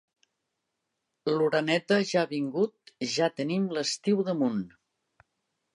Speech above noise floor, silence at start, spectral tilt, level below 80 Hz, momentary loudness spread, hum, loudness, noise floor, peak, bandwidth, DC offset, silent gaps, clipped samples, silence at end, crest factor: 55 dB; 1.25 s; -5 dB/octave; -76 dBFS; 8 LU; none; -28 LUFS; -82 dBFS; -10 dBFS; 11 kHz; under 0.1%; none; under 0.1%; 1.1 s; 18 dB